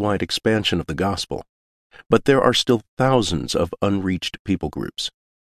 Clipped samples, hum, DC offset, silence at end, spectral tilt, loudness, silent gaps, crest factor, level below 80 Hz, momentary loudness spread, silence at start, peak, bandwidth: under 0.1%; none; under 0.1%; 0.5 s; -5 dB/octave; -21 LUFS; 1.49-1.90 s, 2.89-2.97 s, 4.39-4.45 s; 20 dB; -42 dBFS; 11 LU; 0 s; -2 dBFS; 14 kHz